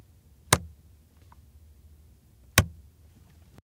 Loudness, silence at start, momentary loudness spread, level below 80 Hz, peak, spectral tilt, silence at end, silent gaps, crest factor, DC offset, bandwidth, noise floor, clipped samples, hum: -26 LUFS; 0.5 s; 12 LU; -48 dBFS; 0 dBFS; -3 dB/octave; 1.05 s; none; 32 dB; under 0.1%; 16 kHz; -56 dBFS; under 0.1%; none